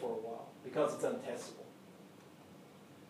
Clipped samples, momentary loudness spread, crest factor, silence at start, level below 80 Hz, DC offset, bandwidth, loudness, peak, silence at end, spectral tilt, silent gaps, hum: under 0.1%; 22 LU; 20 dB; 0 s; under -90 dBFS; under 0.1%; 15.5 kHz; -40 LUFS; -22 dBFS; 0 s; -5 dB/octave; none; none